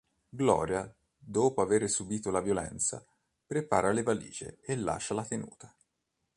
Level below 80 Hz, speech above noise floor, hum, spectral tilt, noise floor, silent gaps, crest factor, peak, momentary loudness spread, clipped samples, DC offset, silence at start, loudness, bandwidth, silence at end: -58 dBFS; 51 dB; none; -4.5 dB/octave; -82 dBFS; none; 22 dB; -10 dBFS; 14 LU; under 0.1%; under 0.1%; 0.35 s; -31 LUFS; 11.5 kHz; 0.7 s